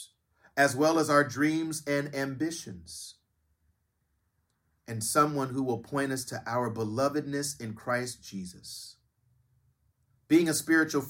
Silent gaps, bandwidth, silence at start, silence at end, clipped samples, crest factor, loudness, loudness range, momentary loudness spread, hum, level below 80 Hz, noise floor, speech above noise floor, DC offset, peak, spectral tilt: none; 16.5 kHz; 0 s; 0 s; under 0.1%; 22 dB; -29 LUFS; 8 LU; 17 LU; none; -68 dBFS; -76 dBFS; 47 dB; under 0.1%; -10 dBFS; -4.5 dB/octave